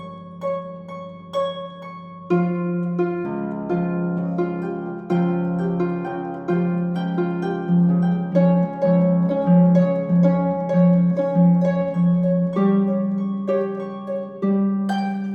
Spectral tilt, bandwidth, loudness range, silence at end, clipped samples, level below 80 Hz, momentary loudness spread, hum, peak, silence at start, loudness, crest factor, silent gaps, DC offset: -10.5 dB/octave; 5 kHz; 7 LU; 0 s; under 0.1%; -60 dBFS; 12 LU; none; -6 dBFS; 0 s; -21 LUFS; 14 dB; none; under 0.1%